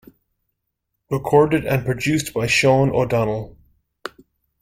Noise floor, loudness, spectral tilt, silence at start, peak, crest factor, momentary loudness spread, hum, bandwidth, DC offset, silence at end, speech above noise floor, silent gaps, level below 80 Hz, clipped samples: -77 dBFS; -19 LUFS; -5.5 dB/octave; 1.1 s; -2 dBFS; 18 dB; 21 LU; none; 16.5 kHz; under 0.1%; 0.55 s; 59 dB; none; -48 dBFS; under 0.1%